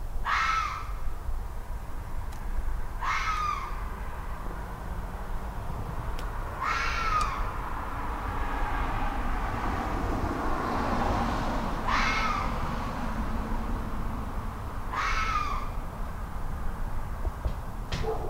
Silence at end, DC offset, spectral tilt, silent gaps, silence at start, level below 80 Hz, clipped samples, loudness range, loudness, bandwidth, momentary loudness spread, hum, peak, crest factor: 0 s; under 0.1%; -5 dB/octave; none; 0 s; -34 dBFS; under 0.1%; 5 LU; -32 LUFS; 16 kHz; 11 LU; none; -14 dBFS; 16 dB